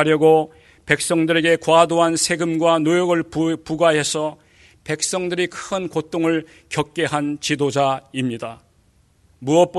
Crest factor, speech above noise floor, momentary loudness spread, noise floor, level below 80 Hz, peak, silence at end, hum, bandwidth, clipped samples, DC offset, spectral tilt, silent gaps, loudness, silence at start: 20 dB; 39 dB; 11 LU; -58 dBFS; -56 dBFS; 0 dBFS; 0 s; none; 12 kHz; under 0.1%; under 0.1%; -4 dB/octave; none; -19 LUFS; 0 s